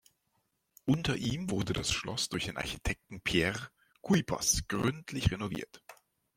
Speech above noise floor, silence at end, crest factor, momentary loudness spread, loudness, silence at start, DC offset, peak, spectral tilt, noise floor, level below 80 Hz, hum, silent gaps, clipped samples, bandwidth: 45 dB; 0.45 s; 22 dB; 10 LU; -32 LUFS; 0.85 s; under 0.1%; -12 dBFS; -4 dB/octave; -78 dBFS; -50 dBFS; none; none; under 0.1%; 16.5 kHz